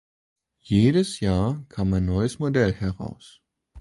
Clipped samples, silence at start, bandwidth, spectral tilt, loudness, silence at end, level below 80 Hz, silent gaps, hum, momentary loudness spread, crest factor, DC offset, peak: under 0.1%; 0.65 s; 11.5 kHz; -7 dB/octave; -23 LUFS; 0 s; -40 dBFS; none; none; 10 LU; 18 dB; under 0.1%; -6 dBFS